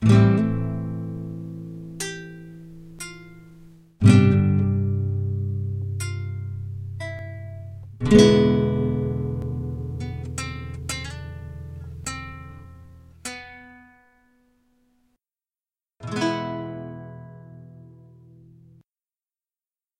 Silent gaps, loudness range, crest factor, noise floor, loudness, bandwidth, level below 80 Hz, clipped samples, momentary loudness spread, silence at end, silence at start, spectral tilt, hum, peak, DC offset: none; 17 LU; 22 dB; under -90 dBFS; -23 LUFS; 12.5 kHz; -44 dBFS; under 0.1%; 25 LU; 2.1 s; 0 s; -7 dB/octave; none; -2 dBFS; under 0.1%